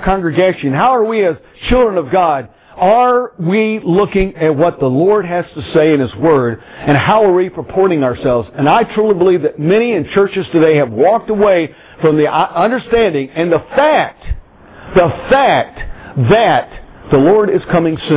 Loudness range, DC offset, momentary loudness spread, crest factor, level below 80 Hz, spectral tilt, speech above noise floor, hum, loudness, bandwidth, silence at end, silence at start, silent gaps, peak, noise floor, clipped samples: 1 LU; under 0.1%; 7 LU; 12 dB; -34 dBFS; -10.5 dB/octave; 24 dB; none; -12 LUFS; 4 kHz; 0 s; 0 s; none; 0 dBFS; -36 dBFS; under 0.1%